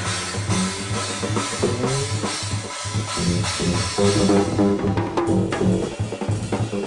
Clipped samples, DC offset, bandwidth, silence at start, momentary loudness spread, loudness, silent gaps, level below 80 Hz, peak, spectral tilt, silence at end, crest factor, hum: under 0.1%; under 0.1%; 11 kHz; 0 s; 7 LU; -22 LUFS; none; -42 dBFS; -4 dBFS; -5 dB/octave; 0 s; 16 dB; none